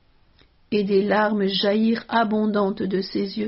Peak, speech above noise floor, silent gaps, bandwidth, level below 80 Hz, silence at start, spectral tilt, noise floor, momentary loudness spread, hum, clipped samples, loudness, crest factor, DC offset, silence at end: -6 dBFS; 35 dB; none; 5.8 kHz; -58 dBFS; 0.7 s; -4 dB/octave; -57 dBFS; 5 LU; none; under 0.1%; -22 LUFS; 16 dB; under 0.1%; 0 s